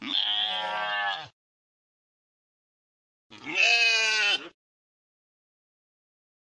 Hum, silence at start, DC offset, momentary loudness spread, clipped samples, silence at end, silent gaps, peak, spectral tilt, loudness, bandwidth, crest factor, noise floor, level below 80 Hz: none; 0 s; under 0.1%; 12 LU; under 0.1%; 2 s; 1.33-3.30 s; -10 dBFS; 1 dB/octave; -23 LUFS; 11.5 kHz; 20 dB; under -90 dBFS; -84 dBFS